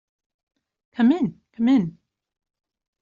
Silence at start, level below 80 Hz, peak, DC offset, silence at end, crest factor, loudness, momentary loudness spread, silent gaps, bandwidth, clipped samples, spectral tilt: 1 s; -64 dBFS; -8 dBFS; under 0.1%; 1.1 s; 16 dB; -22 LUFS; 12 LU; none; 7.2 kHz; under 0.1%; -6.5 dB/octave